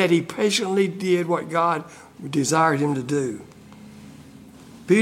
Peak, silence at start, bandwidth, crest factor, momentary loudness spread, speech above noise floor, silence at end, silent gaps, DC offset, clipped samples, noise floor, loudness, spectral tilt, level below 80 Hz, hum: -4 dBFS; 0 s; 16 kHz; 18 dB; 20 LU; 23 dB; 0 s; none; under 0.1%; under 0.1%; -45 dBFS; -22 LUFS; -5 dB/octave; -64 dBFS; none